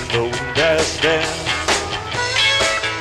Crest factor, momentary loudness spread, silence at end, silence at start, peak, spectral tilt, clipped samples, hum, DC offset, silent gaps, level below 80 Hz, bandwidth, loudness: 14 dB; 6 LU; 0 s; 0 s; -4 dBFS; -2.5 dB/octave; under 0.1%; none; under 0.1%; none; -40 dBFS; 14 kHz; -17 LUFS